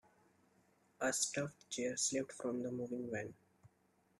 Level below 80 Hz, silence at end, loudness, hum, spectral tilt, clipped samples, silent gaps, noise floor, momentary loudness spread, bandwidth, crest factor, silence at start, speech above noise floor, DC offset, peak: -80 dBFS; 0.55 s; -40 LUFS; none; -3 dB/octave; under 0.1%; none; -76 dBFS; 8 LU; 13.5 kHz; 22 dB; 1 s; 35 dB; under 0.1%; -22 dBFS